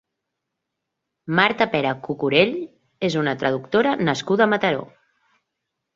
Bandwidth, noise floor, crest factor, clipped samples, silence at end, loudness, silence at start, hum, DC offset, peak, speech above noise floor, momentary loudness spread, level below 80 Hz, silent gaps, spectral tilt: 7.8 kHz; -81 dBFS; 22 dB; under 0.1%; 1.1 s; -21 LUFS; 1.25 s; none; under 0.1%; -2 dBFS; 60 dB; 9 LU; -62 dBFS; none; -5.5 dB/octave